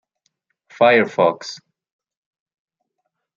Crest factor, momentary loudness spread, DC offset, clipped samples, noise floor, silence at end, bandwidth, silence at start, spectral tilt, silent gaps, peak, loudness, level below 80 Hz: 20 dB; 19 LU; under 0.1%; under 0.1%; -77 dBFS; 1.8 s; 7.4 kHz; 0.8 s; -5 dB/octave; none; -2 dBFS; -16 LUFS; -70 dBFS